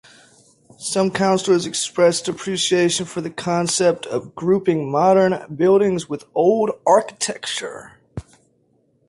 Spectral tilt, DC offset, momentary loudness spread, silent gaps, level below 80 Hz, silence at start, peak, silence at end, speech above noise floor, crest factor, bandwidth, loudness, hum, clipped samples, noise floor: -4 dB/octave; under 0.1%; 11 LU; none; -56 dBFS; 0.8 s; -4 dBFS; 0.85 s; 43 dB; 16 dB; 11.5 kHz; -19 LUFS; none; under 0.1%; -62 dBFS